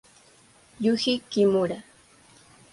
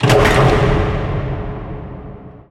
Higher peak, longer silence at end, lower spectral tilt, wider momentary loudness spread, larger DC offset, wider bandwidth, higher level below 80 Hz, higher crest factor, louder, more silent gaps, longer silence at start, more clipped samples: second, -10 dBFS vs 0 dBFS; first, 0.9 s vs 0.1 s; about the same, -5.5 dB/octave vs -6 dB/octave; second, 8 LU vs 21 LU; neither; second, 11.5 kHz vs 15 kHz; second, -66 dBFS vs -24 dBFS; about the same, 18 dB vs 16 dB; second, -24 LUFS vs -15 LUFS; neither; first, 0.8 s vs 0 s; neither